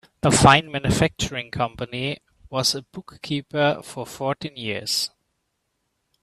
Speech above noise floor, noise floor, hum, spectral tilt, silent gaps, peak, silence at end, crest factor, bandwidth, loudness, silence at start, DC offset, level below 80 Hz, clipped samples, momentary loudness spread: 52 dB; -75 dBFS; none; -4 dB/octave; none; 0 dBFS; 1.15 s; 24 dB; 14 kHz; -22 LUFS; 0.25 s; under 0.1%; -44 dBFS; under 0.1%; 15 LU